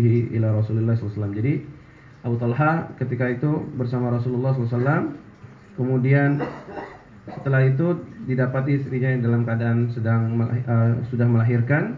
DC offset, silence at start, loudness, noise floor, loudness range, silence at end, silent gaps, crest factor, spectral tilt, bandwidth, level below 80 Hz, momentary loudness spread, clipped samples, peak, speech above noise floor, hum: under 0.1%; 0 s; -22 LUFS; -44 dBFS; 3 LU; 0 s; none; 16 dB; -11 dB/octave; 4.6 kHz; -52 dBFS; 12 LU; under 0.1%; -6 dBFS; 23 dB; none